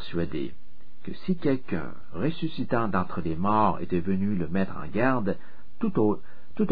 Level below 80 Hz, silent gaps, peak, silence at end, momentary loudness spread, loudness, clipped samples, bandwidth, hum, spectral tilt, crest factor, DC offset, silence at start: -52 dBFS; none; -10 dBFS; 0 s; 12 LU; -28 LUFS; under 0.1%; 5 kHz; none; -10.5 dB/octave; 18 dB; 4%; 0 s